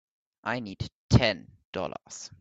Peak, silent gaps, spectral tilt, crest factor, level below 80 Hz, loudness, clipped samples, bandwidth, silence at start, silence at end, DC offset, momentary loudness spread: -6 dBFS; 0.92-1.09 s, 1.65-1.73 s; -5.5 dB/octave; 24 dB; -46 dBFS; -29 LUFS; under 0.1%; 8 kHz; 0.45 s; 0.15 s; under 0.1%; 16 LU